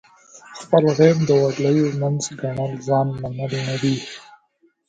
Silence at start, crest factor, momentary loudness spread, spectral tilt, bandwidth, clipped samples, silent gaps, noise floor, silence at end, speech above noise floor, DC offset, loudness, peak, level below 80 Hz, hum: 0.35 s; 20 dB; 13 LU; -6.5 dB/octave; 9.2 kHz; under 0.1%; none; -62 dBFS; 0.7 s; 43 dB; under 0.1%; -20 LUFS; 0 dBFS; -56 dBFS; none